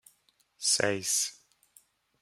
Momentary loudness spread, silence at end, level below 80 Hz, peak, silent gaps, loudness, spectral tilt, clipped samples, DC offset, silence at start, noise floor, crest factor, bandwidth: 6 LU; 0.9 s; -76 dBFS; -10 dBFS; none; -28 LUFS; -1 dB/octave; under 0.1%; under 0.1%; 0.6 s; -69 dBFS; 24 dB; 16.5 kHz